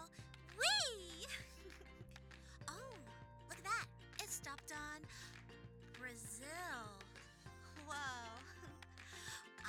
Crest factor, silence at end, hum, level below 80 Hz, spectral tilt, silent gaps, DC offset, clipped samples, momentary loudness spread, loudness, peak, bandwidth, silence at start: 26 dB; 0 s; none; -66 dBFS; -1.5 dB/octave; none; under 0.1%; under 0.1%; 17 LU; -46 LUFS; -22 dBFS; over 20 kHz; 0 s